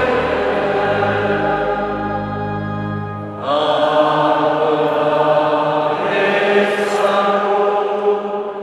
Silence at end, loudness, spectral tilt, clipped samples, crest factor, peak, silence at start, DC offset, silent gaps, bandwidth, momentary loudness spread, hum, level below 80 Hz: 0 s; -17 LUFS; -6 dB/octave; under 0.1%; 16 dB; 0 dBFS; 0 s; under 0.1%; none; 12 kHz; 8 LU; none; -46 dBFS